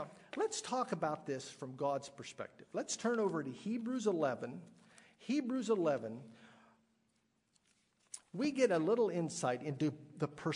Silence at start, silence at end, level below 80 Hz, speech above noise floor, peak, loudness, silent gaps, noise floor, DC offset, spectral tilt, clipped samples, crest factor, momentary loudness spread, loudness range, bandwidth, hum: 0 s; 0 s; -84 dBFS; 42 dB; -20 dBFS; -38 LUFS; none; -79 dBFS; under 0.1%; -5 dB/octave; under 0.1%; 20 dB; 15 LU; 4 LU; 11 kHz; none